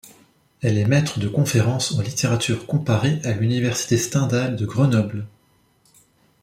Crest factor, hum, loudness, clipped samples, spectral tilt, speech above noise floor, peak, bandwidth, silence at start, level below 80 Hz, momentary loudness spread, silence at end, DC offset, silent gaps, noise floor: 16 dB; none; -21 LUFS; under 0.1%; -5.5 dB/octave; 40 dB; -4 dBFS; 15.5 kHz; 0.05 s; -54 dBFS; 4 LU; 1.15 s; under 0.1%; none; -60 dBFS